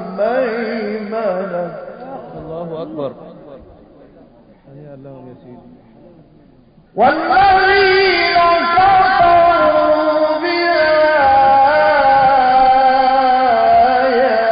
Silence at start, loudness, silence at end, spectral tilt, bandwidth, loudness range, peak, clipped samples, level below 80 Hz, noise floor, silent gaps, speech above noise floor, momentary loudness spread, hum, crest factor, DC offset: 0 s; -12 LUFS; 0 s; -9.5 dB/octave; 5.2 kHz; 19 LU; -2 dBFS; under 0.1%; -44 dBFS; -47 dBFS; none; 32 dB; 16 LU; none; 12 dB; under 0.1%